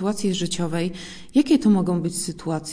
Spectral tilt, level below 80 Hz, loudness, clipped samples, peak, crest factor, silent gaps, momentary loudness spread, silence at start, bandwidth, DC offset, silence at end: -5.5 dB/octave; -52 dBFS; -22 LUFS; under 0.1%; -6 dBFS; 16 dB; none; 10 LU; 0 s; 10.5 kHz; under 0.1%; 0 s